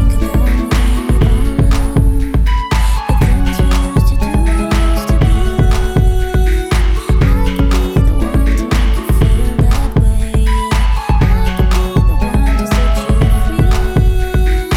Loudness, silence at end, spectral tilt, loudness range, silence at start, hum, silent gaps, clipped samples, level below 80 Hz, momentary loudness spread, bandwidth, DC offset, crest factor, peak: -14 LUFS; 0 s; -6.5 dB/octave; 0 LU; 0 s; none; none; under 0.1%; -12 dBFS; 2 LU; 14.5 kHz; under 0.1%; 10 dB; -2 dBFS